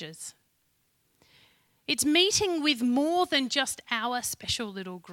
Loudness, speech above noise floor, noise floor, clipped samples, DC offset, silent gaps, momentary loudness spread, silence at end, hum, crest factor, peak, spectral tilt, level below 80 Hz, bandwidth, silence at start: -26 LUFS; 44 dB; -72 dBFS; under 0.1%; under 0.1%; none; 18 LU; 0 s; none; 20 dB; -10 dBFS; -2 dB/octave; -60 dBFS; 17 kHz; 0 s